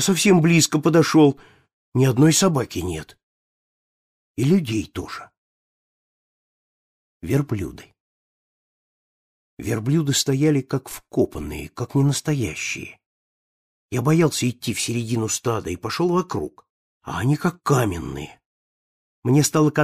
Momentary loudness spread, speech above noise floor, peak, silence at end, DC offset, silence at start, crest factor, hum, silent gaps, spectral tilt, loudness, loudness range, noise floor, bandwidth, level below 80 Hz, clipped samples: 17 LU; over 70 dB; -4 dBFS; 0 s; under 0.1%; 0 s; 18 dB; none; 1.73-1.92 s, 3.23-4.35 s, 5.37-7.20 s, 8.00-9.57 s, 13.06-13.89 s, 16.70-17.01 s, 18.46-19.22 s; -5 dB/octave; -21 LUFS; 11 LU; under -90 dBFS; 15.5 kHz; -50 dBFS; under 0.1%